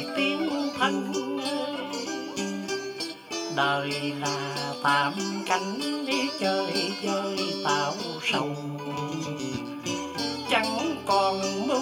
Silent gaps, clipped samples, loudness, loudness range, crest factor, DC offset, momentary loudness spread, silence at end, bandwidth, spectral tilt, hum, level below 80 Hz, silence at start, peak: none; under 0.1%; -28 LUFS; 3 LU; 20 dB; under 0.1%; 8 LU; 0 s; 17.5 kHz; -3.5 dB/octave; none; -68 dBFS; 0 s; -8 dBFS